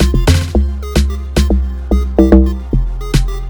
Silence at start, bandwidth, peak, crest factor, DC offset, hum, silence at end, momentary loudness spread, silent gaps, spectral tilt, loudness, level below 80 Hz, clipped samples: 0 s; 19.5 kHz; 0 dBFS; 12 dB; under 0.1%; none; 0 s; 8 LU; none; -6.5 dB/octave; -14 LUFS; -14 dBFS; 0.3%